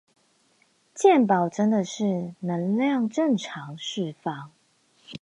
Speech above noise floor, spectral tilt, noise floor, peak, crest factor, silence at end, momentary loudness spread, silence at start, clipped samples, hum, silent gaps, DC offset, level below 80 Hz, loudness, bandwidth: 41 dB; -6 dB/octave; -65 dBFS; -6 dBFS; 20 dB; 0.05 s; 15 LU; 0.95 s; under 0.1%; none; none; under 0.1%; -74 dBFS; -24 LUFS; 10.5 kHz